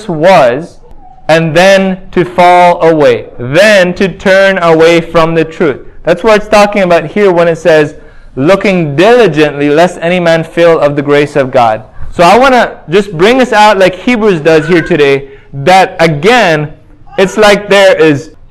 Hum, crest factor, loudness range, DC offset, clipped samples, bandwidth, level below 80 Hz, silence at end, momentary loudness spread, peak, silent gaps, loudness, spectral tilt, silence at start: none; 6 dB; 2 LU; under 0.1%; 5%; 16 kHz; -34 dBFS; 0.2 s; 8 LU; 0 dBFS; none; -6 LUFS; -5.5 dB/octave; 0 s